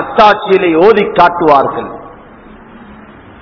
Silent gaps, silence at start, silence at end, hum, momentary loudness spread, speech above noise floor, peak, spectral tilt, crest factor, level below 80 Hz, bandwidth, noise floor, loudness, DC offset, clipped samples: none; 0 s; 0.5 s; none; 15 LU; 27 dB; 0 dBFS; -6.5 dB/octave; 10 dB; -42 dBFS; 5.4 kHz; -35 dBFS; -9 LUFS; under 0.1%; 3%